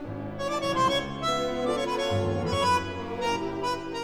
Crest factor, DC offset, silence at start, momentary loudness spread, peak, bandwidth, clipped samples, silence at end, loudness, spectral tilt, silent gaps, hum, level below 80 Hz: 14 dB; 0.2%; 0 s; 6 LU; -14 dBFS; 16.5 kHz; under 0.1%; 0 s; -28 LUFS; -5 dB/octave; none; none; -50 dBFS